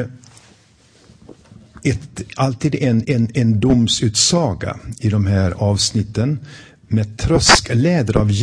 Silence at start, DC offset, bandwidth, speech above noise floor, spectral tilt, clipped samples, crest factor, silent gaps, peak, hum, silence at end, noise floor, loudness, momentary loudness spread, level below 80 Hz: 0 s; under 0.1%; 10.5 kHz; 35 dB; -4.5 dB/octave; under 0.1%; 18 dB; none; 0 dBFS; none; 0 s; -51 dBFS; -17 LUFS; 11 LU; -36 dBFS